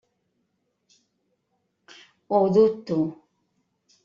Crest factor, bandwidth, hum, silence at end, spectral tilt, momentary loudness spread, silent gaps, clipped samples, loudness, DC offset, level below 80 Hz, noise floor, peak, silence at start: 20 dB; 7.2 kHz; none; 0.9 s; -8 dB/octave; 8 LU; none; under 0.1%; -22 LUFS; under 0.1%; -68 dBFS; -75 dBFS; -8 dBFS; 2.3 s